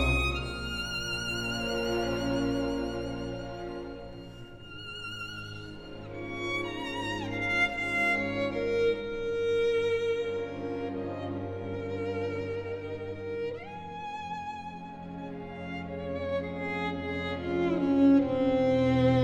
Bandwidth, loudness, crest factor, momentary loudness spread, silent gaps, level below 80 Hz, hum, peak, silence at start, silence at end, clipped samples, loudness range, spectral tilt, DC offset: 13.5 kHz; -31 LUFS; 18 dB; 15 LU; none; -46 dBFS; none; -14 dBFS; 0 s; 0 s; under 0.1%; 10 LU; -6 dB/octave; under 0.1%